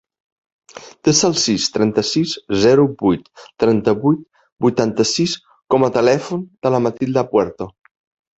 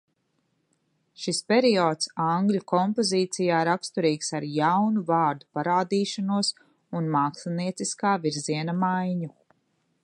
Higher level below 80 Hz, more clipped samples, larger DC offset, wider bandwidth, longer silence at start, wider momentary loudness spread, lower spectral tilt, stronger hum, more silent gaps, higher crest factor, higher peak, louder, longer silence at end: first, -52 dBFS vs -76 dBFS; neither; neither; second, 8.2 kHz vs 11.5 kHz; second, 0.75 s vs 1.2 s; about the same, 8 LU vs 8 LU; about the same, -4.5 dB/octave vs -5 dB/octave; neither; first, 4.52-4.56 s vs none; about the same, 16 dB vs 18 dB; first, 0 dBFS vs -8 dBFS; first, -17 LUFS vs -25 LUFS; about the same, 0.7 s vs 0.75 s